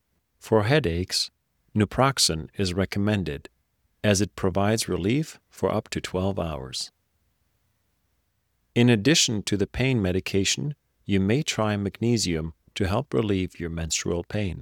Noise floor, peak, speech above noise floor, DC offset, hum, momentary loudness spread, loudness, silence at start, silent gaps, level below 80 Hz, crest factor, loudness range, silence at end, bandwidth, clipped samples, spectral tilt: -72 dBFS; -6 dBFS; 48 dB; under 0.1%; none; 11 LU; -25 LUFS; 0.45 s; none; -48 dBFS; 20 dB; 5 LU; 0 s; 18 kHz; under 0.1%; -4.5 dB/octave